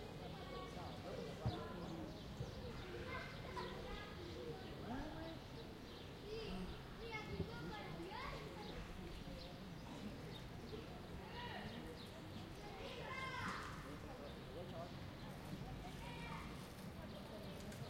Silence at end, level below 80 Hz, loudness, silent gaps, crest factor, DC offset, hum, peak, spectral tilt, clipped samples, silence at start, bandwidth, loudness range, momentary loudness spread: 0 s; -60 dBFS; -51 LUFS; none; 20 dB; under 0.1%; none; -30 dBFS; -5.5 dB/octave; under 0.1%; 0 s; 16 kHz; 3 LU; 6 LU